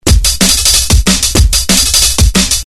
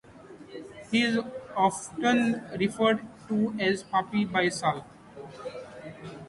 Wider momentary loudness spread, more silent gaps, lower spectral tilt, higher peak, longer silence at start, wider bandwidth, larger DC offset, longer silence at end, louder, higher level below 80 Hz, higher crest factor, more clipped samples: second, 3 LU vs 19 LU; neither; second, -2.5 dB/octave vs -4.5 dB/octave; first, 0 dBFS vs -10 dBFS; about the same, 0.05 s vs 0.1 s; first, over 20 kHz vs 11.5 kHz; neither; about the same, 0.05 s vs 0 s; first, -7 LUFS vs -27 LUFS; first, -14 dBFS vs -64 dBFS; second, 8 dB vs 18 dB; first, 1% vs under 0.1%